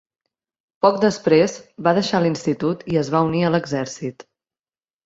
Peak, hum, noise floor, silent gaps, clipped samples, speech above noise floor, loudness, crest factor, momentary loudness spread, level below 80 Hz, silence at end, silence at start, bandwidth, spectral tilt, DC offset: -2 dBFS; none; under -90 dBFS; none; under 0.1%; over 71 dB; -20 LUFS; 18 dB; 9 LU; -58 dBFS; 0.85 s; 0.85 s; 8 kHz; -6 dB/octave; under 0.1%